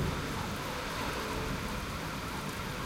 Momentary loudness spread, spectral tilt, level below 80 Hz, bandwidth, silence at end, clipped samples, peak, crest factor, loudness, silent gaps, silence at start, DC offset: 2 LU; -4.5 dB/octave; -46 dBFS; 17 kHz; 0 s; under 0.1%; -22 dBFS; 14 dB; -36 LUFS; none; 0 s; under 0.1%